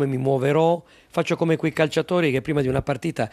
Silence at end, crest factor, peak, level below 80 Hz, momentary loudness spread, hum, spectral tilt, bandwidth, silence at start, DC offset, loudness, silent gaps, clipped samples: 0.05 s; 16 dB; -4 dBFS; -50 dBFS; 7 LU; none; -6.5 dB/octave; 14 kHz; 0 s; under 0.1%; -22 LUFS; none; under 0.1%